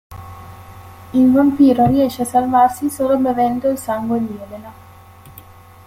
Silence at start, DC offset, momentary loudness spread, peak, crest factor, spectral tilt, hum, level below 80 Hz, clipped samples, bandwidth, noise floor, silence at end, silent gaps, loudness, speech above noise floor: 0.1 s; under 0.1%; 23 LU; -2 dBFS; 14 dB; -6.5 dB/octave; none; -48 dBFS; under 0.1%; 16 kHz; -41 dBFS; 0.45 s; none; -16 LUFS; 26 dB